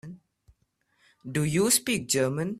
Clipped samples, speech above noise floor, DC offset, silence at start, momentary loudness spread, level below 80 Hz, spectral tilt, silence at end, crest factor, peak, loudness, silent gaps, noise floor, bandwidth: under 0.1%; 46 dB; under 0.1%; 0.05 s; 20 LU; -60 dBFS; -3.5 dB/octave; 0 s; 20 dB; -8 dBFS; -25 LUFS; none; -72 dBFS; 16 kHz